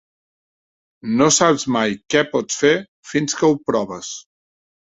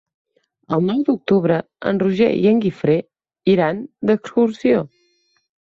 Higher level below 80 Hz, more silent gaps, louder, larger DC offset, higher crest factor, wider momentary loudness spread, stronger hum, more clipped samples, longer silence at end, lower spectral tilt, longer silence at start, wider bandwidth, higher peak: about the same, -58 dBFS vs -58 dBFS; first, 2.88-3.03 s vs none; about the same, -18 LUFS vs -18 LUFS; neither; about the same, 18 dB vs 16 dB; first, 15 LU vs 6 LU; neither; neither; second, 0.75 s vs 0.9 s; second, -3.5 dB/octave vs -8.5 dB/octave; first, 1.05 s vs 0.7 s; first, 8.2 kHz vs 7.4 kHz; about the same, -2 dBFS vs -4 dBFS